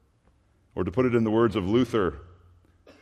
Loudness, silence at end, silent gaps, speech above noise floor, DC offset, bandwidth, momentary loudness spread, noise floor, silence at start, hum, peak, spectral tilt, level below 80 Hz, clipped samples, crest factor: -25 LUFS; 0.75 s; none; 40 dB; under 0.1%; 10.5 kHz; 12 LU; -64 dBFS; 0.75 s; none; -10 dBFS; -8 dB/octave; -54 dBFS; under 0.1%; 18 dB